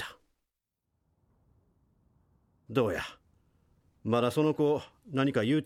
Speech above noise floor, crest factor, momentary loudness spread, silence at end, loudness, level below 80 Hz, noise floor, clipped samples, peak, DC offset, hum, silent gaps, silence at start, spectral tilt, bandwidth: 57 dB; 20 dB; 13 LU; 0 s; -30 LUFS; -66 dBFS; -85 dBFS; under 0.1%; -12 dBFS; under 0.1%; none; none; 0 s; -6.5 dB/octave; 15.5 kHz